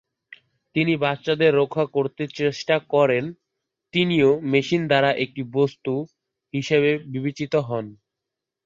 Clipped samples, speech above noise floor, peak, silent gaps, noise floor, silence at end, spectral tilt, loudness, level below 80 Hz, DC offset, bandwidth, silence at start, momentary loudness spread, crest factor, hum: under 0.1%; 63 dB; -4 dBFS; none; -85 dBFS; 0.7 s; -6.5 dB/octave; -22 LUFS; -64 dBFS; under 0.1%; 7.6 kHz; 0.75 s; 11 LU; 18 dB; none